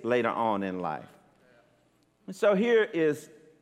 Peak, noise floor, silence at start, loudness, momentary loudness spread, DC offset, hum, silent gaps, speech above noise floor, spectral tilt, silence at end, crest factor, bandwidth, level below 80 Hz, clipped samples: -12 dBFS; -67 dBFS; 0 s; -27 LUFS; 14 LU; under 0.1%; none; none; 40 dB; -6 dB/octave; 0.35 s; 18 dB; 14 kHz; -78 dBFS; under 0.1%